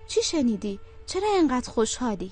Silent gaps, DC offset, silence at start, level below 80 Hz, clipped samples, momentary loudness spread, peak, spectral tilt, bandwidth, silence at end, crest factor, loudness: none; under 0.1%; 0 s; -46 dBFS; under 0.1%; 10 LU; -10 dBFS; -4 dB/octave; 9.6 kHz; 0 s; 14 dB; -26 LUFS